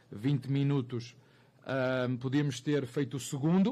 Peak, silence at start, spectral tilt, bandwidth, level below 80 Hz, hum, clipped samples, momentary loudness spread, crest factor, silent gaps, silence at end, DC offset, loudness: -20 dBFS; 0.1 s; -6.5 dB/octave; 13.5 kHz; -72 dBFS; none; under 0.1%; 10 LU; 12 dB; none; 0 s; under 0.1%; -32 LUFS